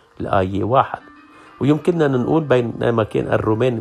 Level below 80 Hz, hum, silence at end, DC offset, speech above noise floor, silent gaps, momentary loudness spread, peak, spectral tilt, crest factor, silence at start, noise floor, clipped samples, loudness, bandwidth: -48 dBFS; none; 0 s; under 0.1%; 27 dB; none; 4 LU; -2 dBFS; -8 dB/octave; 18 dB; 0.2 s; -44 dBFS; under 0.1%; -18 LUFS; 11.5 kHz